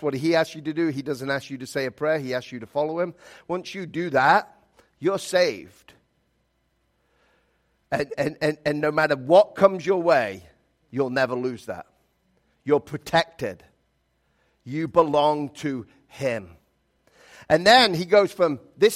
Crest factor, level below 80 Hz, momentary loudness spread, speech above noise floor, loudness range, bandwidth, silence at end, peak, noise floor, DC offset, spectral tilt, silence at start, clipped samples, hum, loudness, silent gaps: 22 dB; -62 dBFS; 14 LU; 47 dB; 7 LU; 15.5 kHz; 0 s; -2 dBFS; -70 dBFS; under 0.1%; -5 dB/octave; 0 s; under 0.1%; none; -23 LUFS; none